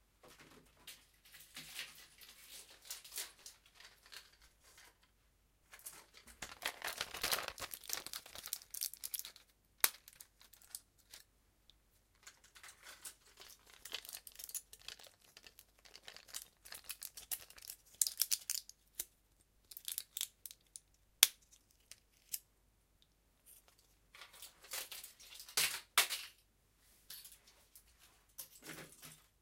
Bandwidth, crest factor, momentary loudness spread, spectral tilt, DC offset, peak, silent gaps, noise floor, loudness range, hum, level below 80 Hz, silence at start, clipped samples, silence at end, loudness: 17 kHz; 44 dB; 25 LU; 1.5 dB/octave; under 0.1%; -2 dBFS; none; -74 dBFS; 15 LU; none; -74 dBFS; 0.25 s; under 0.1%; 0.25 s; -41 LUFS